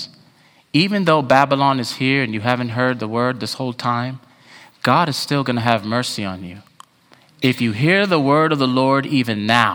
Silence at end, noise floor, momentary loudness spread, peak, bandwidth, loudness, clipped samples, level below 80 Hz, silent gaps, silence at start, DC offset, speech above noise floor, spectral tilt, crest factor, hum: 0 s; -53 dBFS; 9 LU; 0 dBFS; over 20 kHz; -18 LUFS; under 0.1%; -62 dBFS; none; 0 s; under 0.1%; 35 dB; -5.5 dB/octave; 18 dB; none